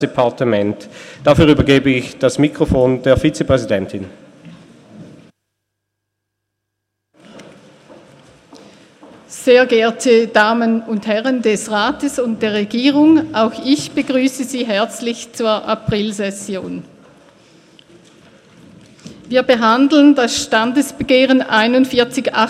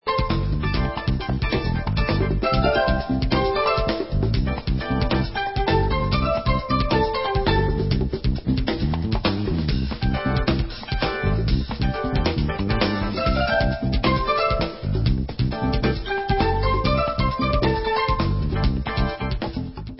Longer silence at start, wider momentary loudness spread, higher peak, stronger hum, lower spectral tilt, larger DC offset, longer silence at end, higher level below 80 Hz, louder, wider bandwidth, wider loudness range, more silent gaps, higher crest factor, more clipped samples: about the same, 0 s vs 0.05 s; first, 11 LU vs 4 LU; first, 0 dBFS vs -6 dBFS; neither; second, -5 dB/octave vs -10.5 dB/octave; second, under 0.1% vs 0.3%; about the same, 0 s vs 0 s; second, -40 dBFS vs -28 dBFS; first, -14 LUFS vs -23 LUFS; first, 14.5 kHz vs 5.8 kHz; first, 10 LU vs 2 LU; neither; about the same, 16 dB vs 16 dB; neither